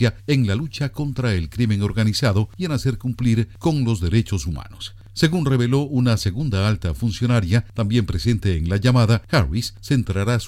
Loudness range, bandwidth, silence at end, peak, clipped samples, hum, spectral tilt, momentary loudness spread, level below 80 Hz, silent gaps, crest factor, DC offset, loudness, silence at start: 2 LU; 14.5 kHz; 0 s; -6 dBFS; under 0.1%; none; -6.5 dB/octave; 7 LU; -36 dBFS; none; 14 dB; under 0.1%; -21 LUFS; 0 s